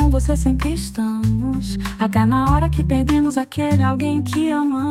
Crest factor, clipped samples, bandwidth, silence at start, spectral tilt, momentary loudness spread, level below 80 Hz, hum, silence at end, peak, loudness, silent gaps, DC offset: 14 dB; under 0.1%; 15 kHz; 0 s; -7 dB/octave; 6 LU; -24 dBFS; none; 0 s; -4 dBFS; -19 LUFS; none; under 0.1%